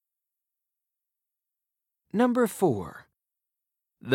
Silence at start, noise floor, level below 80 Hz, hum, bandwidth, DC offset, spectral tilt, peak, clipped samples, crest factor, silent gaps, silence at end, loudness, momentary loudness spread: 2.15 s; -87 dBFS; -72 dBFS; none; 16.5 kHz; under 0.1%; -6 dB/octave; -10 dBFS; under 0.1%; 22 dB; none; 0 s; -26 LUFS; 18 LU